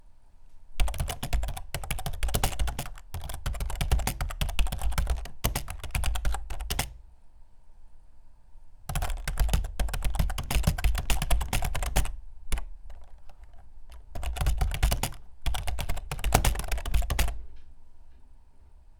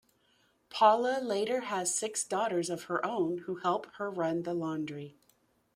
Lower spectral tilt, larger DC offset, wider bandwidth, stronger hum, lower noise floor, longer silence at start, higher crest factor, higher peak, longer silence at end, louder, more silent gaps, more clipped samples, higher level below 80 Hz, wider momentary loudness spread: about the same, -4 dB/octave vs -3.5 dB/octave; neither; first, over 20 kHz vs 16 kHz; neither; second, -51 dBFS vs -71 dBFS; second, 0.05 s vs 0.7 s; about the same, 26 dB vs 22 dB; first, -2 dBFS vs -12 dBFS; second, 0.05 s vs 0.65 s; about the same, -32 LUFS vs -31 LUFS; neither; neither; first, -32 dBFS vs -78 dBFS; about the same, 11 LU vs 12 LU